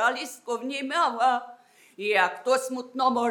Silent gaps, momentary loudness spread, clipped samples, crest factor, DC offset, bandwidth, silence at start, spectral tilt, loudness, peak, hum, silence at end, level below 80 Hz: none; 10 LU; under 0.1%; 18 dB; under 0.1%; 18 kHz; 0 s; -2 dB/octave; -26 LUFS; -8 dBFS; none; 0 s; under -90 dBFS